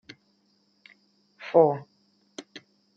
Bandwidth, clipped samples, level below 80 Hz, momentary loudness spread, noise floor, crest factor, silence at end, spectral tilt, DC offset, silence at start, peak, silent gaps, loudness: 7.6 kHz; under 0.1%; -84 dBFS; 27 LU; -68 dBFS; 24 dB; 0.4 s; -7 dB/octave; under 0.1%; 1.4 s; -6 dBFS; none; -23 LUFS